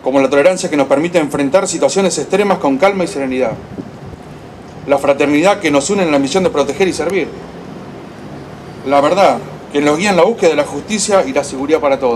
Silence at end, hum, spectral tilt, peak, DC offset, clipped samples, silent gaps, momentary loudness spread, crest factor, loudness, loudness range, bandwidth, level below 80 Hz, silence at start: 0 s; none; -4.5 dB/octave; 0 dBFS; under 0.1%; under 0.1%; none; 19 LU; 14 dB; -13 LUFS; 3 LU; 13 kHz; -46 dBFS; 0 s